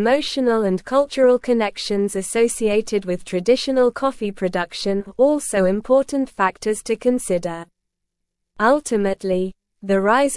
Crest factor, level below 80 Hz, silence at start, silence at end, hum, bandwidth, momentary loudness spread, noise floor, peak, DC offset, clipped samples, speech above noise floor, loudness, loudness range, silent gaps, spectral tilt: 16 dB; -50 dBFS; 0 s; 0 s; none; 12 kHz; 7 LU; -78 dBFS; -4 dBFS; 0.1%; under 0.1%; 59 dB; -20 LUFS; 3 LU; none; -4.5 dB/octave